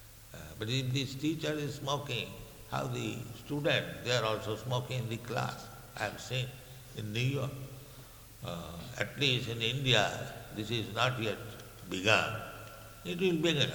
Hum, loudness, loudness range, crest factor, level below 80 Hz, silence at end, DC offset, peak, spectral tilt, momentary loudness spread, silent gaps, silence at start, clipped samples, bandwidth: none; -34 LUFS; 6 LU; 24 dB; -58 dBFS; 0 s; under 0.1%; -10 dBFS; -4.5 dB/octave; 18 LU; none; 0 s; under 0.1%; 19.5 kHz